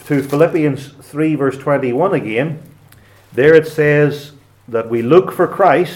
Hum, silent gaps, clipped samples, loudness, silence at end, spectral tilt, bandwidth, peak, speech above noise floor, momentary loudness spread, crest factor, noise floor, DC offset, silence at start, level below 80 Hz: none; none; under 0.1%; -14 LUFS; 0 s; -7.5 dB/octave; 17 kHz; 0 dBFS; 31 dB; 13 LU; 14 dB; -45 dBFS; under 0.1%; 0.05 s; -56 dBFS